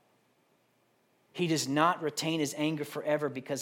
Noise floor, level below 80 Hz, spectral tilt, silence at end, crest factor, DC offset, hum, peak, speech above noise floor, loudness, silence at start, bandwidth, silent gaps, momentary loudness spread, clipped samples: -71 dBFS; -82 dBFS; -4.5 dB/octave; 0 s; 22 dB; under 0.1%; none; -10 dBFS; 40 dB; -31 LUFS; 1.35 s; 17 kHz; none; 8 LU; under 0.1%